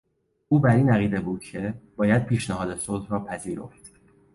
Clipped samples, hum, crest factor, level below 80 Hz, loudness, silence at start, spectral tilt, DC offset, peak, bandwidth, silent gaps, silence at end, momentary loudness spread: under 0.1%; none; 18 dB; -50 dBFS; -24 LUFS; 0.5 s; -7 dB/octave; under 0.1%; -8 dBFS; 11.5 kHz; none; 0.45 s; 14 LU